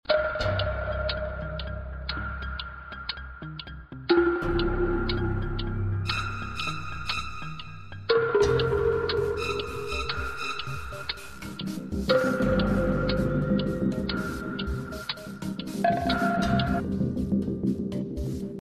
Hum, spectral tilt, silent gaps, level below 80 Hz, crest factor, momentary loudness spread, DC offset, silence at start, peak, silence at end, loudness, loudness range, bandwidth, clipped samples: none; -6.5 dB/octave; none; -38 dBFS; 18 dB; 12 LU; under 0.1%; 0.05 s; -10 dBFS; 0.05 s; -28 LUFS; 4 LU; 14 kHz; under 0.1%